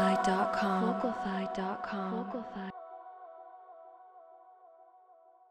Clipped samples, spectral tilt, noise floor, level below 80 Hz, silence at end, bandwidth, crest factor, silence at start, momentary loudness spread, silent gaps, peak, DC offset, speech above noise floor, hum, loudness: under 0.1%; -6 dB/octave; -61 dBFS; -68 dBFS; 0.4 s; 11.5 kHz; 18 dB; 0 s; 24 LU; none; -18 dBFS; under 0.1%; 28 dB; none; -33 LUFS